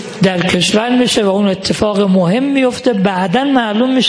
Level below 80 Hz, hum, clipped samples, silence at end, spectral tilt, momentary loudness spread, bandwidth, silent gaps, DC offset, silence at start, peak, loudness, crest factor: -44 dBFS; none; under 0.1%; 0 s; -5 dB/octave; 3 LU; 10.5 kHz; none; under 0.1%; 0 s; 0 dBFS; -13 LUFS; 12 dB